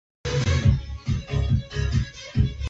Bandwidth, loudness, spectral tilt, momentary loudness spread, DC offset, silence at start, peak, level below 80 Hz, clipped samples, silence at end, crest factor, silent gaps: 8 kHz; -25 LUFS; -6 dB/octave; 8 LU; under 0.1%; 0.25 s; -6 dBFS; -30 dBFS; under 0.1%; 0 s; 18 dB; none